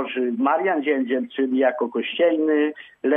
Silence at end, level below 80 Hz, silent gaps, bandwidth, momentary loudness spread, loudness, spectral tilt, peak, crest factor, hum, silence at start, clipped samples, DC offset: 0 s; -78 dBFS; none; 3.8 kHz; 5 LU; -22 LUFS; -7.5 dB/octave; -6 dBFS; 14 dB; none; 0 s; under 0.1%; under 0.1%